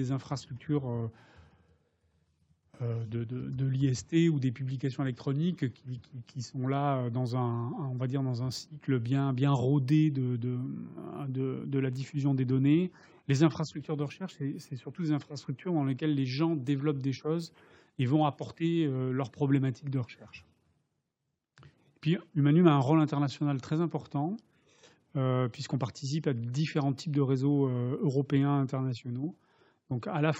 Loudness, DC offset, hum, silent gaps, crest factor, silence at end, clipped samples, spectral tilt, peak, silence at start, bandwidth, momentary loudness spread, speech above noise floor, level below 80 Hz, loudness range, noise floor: -31 LUFS; under 0.1%; none; none; 22 dB; 0 s; under 0.1%; -7.5 dB/octave; -8 dBFS; 0 s; 8.2 kHz; 12 LU; 54 dB; -74 dBFS; 5 LU; -84 dBFS